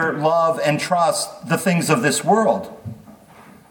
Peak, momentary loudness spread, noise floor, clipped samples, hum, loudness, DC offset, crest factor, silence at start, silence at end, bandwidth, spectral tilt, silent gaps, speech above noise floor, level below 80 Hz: -4 dBFS; 10 LU; -46 dBFS; under 0.1%; none; -18 LUFS; under 0.1%; 16 dB; 0 s; 0.6 s; 19 kHz; -4.5 dB/octave; none; 27 dB; -62 dBFS